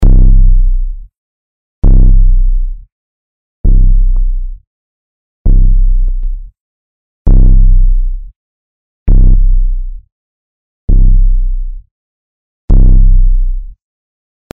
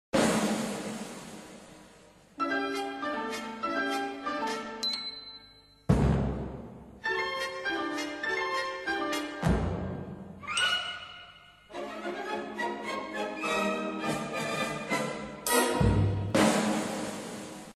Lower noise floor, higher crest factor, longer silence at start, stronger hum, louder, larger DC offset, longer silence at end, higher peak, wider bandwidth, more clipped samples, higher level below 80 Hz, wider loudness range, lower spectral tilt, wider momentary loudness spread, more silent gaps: first, under -90 dBFS vs -56 dBFS; second, 8 dB vs 20 dB; second, 0 s vs 0.15 s; neither; first, -13 LUFS vs -31 LUFS; neither; first, 0.7 s vs 0.05 s; first, 0 dBFS vs -10 dBFS; second, 0.9 kHz vs 13 kHz; neither; first, -8 dBFS vs -44 dBFS; about the same, 3 LU vs 5 LU; first, -11 dB/octave vs -4.5 dB/octave; about the same, 16 LU vs 16 LU; first, 1.18-1.82 s, 2.92-3.64 s, 4.67-5.45 s, 6.60-7.25 s, 8.36-9.06 s, 10.12-10.88 s, 11.91-12.68 s vs none